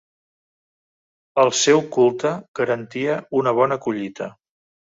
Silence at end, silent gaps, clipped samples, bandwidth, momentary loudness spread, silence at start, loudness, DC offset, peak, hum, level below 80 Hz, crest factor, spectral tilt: 0.6 s; 2.48-2.54 s; under 0.1%; 7.8 kHz; 11 LU; 1.35 s; -20 LUFS; under 0.1%; -2 dBFS; none; -66 dBFS; 18 dB; -4 dB/octave